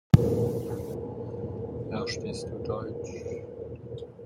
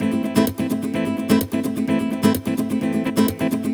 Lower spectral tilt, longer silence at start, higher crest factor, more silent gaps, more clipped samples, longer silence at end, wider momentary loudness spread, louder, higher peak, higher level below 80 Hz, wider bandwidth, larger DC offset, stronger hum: first, -7.5 dB/octave vs -6 dB/octave; first, 0.15 s vs 0 s; first, 28 dB vs 18 dB; neither; neither; about the same, 0 s vs 0 s; first, 14 LU vs 4 LU; second, -32 LUFS vs -21 LUFS; about the same, -2 dBFS vs -2 dBFS; about the same, -48 dBFS vs -50 dBFS; second, 16 kHz vs over 20 kHz; neither; neither